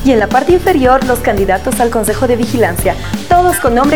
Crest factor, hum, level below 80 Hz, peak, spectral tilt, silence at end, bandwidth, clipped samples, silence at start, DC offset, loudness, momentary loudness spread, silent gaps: 10 dB; none; -26 dBFS; 0 dBFS; -5 dB/octave; 0 s; over 20 kHz; under 0.1%; 0 s; 4%; -11 LUFS; 4 LU; none